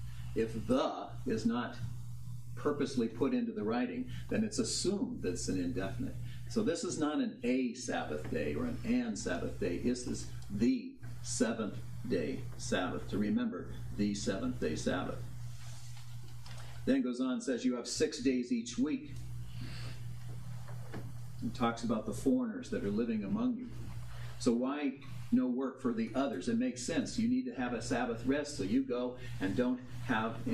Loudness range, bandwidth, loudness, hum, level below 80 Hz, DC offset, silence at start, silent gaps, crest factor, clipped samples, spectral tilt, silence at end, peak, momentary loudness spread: 3 LU; 14 kHz; -36 LUFS; none; -54 dBFS; 0.4%; 0 s; none; 18 dB; under 0.1%; -5.5 dB/octave; 0 s; -18 dBFS; 13 LU